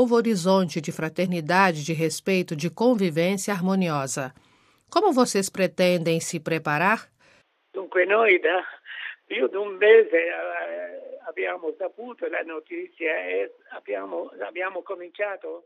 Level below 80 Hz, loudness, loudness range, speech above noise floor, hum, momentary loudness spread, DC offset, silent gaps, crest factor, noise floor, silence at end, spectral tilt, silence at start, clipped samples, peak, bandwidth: -74 dBFS; -24 LUFS; 9 LU; 37 dB; none; 15 LU; under 0.1%; none; 20 dB; -60 dBFS; 0.05 s; -5 dB/octave; 0 s; under 0.1%; -6 dBFS; 15 kHz